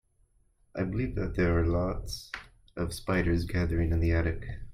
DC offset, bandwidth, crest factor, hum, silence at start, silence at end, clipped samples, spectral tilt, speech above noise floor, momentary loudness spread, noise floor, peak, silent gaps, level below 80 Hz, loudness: under 0.1%; 14 kHz; 16 dB; none; 0.75 s; 0 s; under 0.1%; -7 dB/octave; 38 dB; 12 LU; -67 dBFS; -14 dBFS; none; -40 dBFS; -30 LUFS